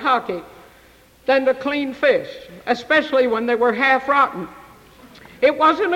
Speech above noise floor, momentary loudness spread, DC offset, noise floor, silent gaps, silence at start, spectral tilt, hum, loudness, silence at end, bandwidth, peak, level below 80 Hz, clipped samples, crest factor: 32 dB; 15 LU; under 0.1%; -50 dBFS; none; 0 s; -5 dB/octave; none; -18 LUFS; 0 s; 16 kHz; -6 dBFS; -58 dBFS; under 0.1%; 14 dB